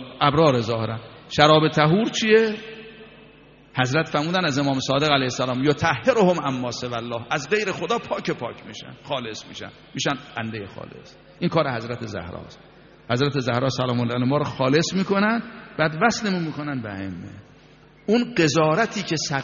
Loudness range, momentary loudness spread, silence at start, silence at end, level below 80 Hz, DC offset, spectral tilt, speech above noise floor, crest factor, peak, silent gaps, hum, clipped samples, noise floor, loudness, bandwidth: 8 LU; 17 LU; 0 s; 0 s; -56 dBFS; under 0.1%; -4 dB/octave; 28 dB; 22 dB; 0 dBFS; none; none; under 0.1%; -50 dBFS; -22 LUFS; 7.2 kHz